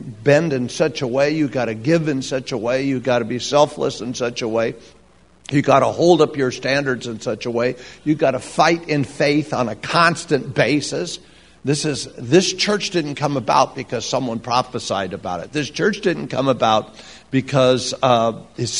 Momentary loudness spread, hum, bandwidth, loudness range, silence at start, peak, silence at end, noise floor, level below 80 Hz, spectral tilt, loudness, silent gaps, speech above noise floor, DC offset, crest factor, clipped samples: 9 LU; none; 11 kHz; 2 LU; 0 s; 0 dBFS; 0 s; -49 dBFS; -54 dBFS; -5 dB/octave; -19 LUFS; none; 30 dB; 0.2%; 20 dB; under 0.1%